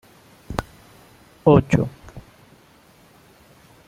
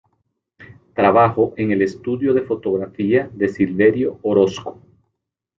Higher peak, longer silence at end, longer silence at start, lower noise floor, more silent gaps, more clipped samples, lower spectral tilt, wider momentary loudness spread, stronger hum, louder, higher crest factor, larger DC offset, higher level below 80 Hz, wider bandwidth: about the same, -2 dBFS vs -2 dBFS; first, 1.7 s vs 0.9 s; about the same, 0.5 s vs 0.6 s; second, -52 dBFS vs -77 dBFS; neither; neither; about the same, -8 dB/octave vs -7.5 dB/octave; first, 24 LU vs 8 LU; neither; about the same, -20 LUFS vs -18 LUFS; about the same, 22 dB vs 18 dB; neither; first, -44 dBFS vs -56 dBFS; first, 14.5 kHz vs 7.4 kHz